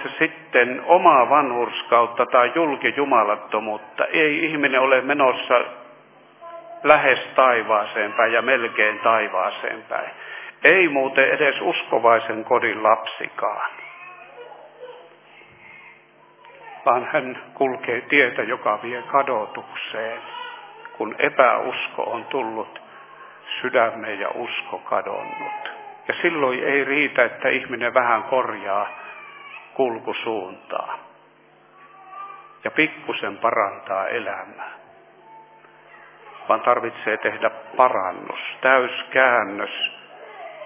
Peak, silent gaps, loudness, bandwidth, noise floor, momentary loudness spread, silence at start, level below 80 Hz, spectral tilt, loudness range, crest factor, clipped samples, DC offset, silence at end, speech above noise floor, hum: 0 dBFS; none; -20 LUFS; 3.8 kHz; -53 dBFS; 19 LU; 0 s; -74 dBFS; -7.5 dB/octave; 9 LU; 22 dB; under 0.1%; under 0.1%; 0 s; 32 dB; none